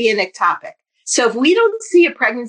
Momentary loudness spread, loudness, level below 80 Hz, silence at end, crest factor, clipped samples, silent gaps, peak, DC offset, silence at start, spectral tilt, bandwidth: 7 LU; -15 LUFS; -70 dBFS; 0 s; 12 dB; under 0.1%; none; -2 dBFS; under 0.1%; 0 s; -2 dB/octave; 10.5 kHz